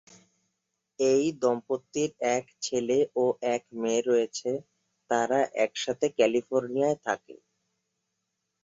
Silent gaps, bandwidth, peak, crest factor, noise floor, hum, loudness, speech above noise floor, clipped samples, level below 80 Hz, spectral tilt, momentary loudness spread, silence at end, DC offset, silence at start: none; 7.8 kHz; -10 dBFS; 20 dB; -82 dBFS; none; -28 LUFS; 55 dB; under 0.1%; -72 dBFS; -4 dB/octave; 7 LU; 1.3 s; under 0.1%; 1 s